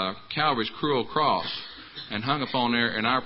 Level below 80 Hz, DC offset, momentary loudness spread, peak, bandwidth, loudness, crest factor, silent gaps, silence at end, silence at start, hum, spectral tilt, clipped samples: -60 dBFS; under 0.1%; 10 LU; -10 dBFS; 5.8 kHz; -26 LUFS; 18 dB; none; 0 s; 0 s; none; -9 dB/octave; under 0.1%